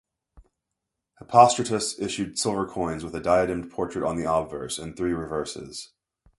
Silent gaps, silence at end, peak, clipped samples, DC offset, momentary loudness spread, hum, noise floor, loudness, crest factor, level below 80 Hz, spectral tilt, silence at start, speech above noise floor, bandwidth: none; 0.55 s; 0 dBFS; under 0.1%; under 0.1%; 15 LU; none; -84 dBFS; -25 LUFS; 26 dB; -52 dBFS; -4 dB/octave; 0.35 s; 59 dB; 11.5 kHz